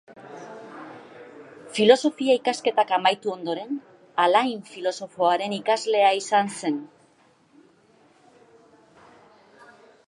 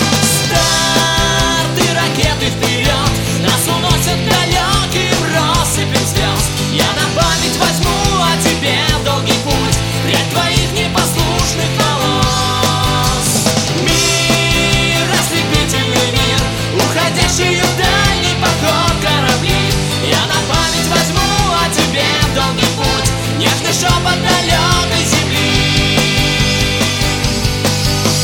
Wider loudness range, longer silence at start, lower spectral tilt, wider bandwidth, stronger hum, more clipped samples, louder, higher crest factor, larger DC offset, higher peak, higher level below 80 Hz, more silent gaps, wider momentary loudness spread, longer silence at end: first, 6 LU vs 1 LU; about the same, 0.1 s vs 0 s; about the same, -3.5 dB/octave vs -3.5 dB/octave; second, 11.5 kHz vs 17.5 kHz; neither; neither; second, -23 LUFS vs -12 LUFS; first, 24 dB vs 12 dB; neither; about the same, -2 dBFS vs 0 dBFS; second, -80 dBFS vs -26 dBFS; neither; first, 23 LU vs 3 LU; first, 3.2 s vs 0 s